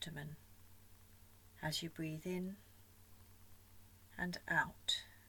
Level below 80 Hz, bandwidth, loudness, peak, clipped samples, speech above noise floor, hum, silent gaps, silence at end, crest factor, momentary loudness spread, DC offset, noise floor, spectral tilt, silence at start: -68 dBFS; 19 kHz; -42 LUFS; -22 dBFS; under 0.1%; 21 dB; none; none; 0 s; 24 dB; 26 LU; under 0.1%; -63 dBFS; -3.5 dB/octave; 0 s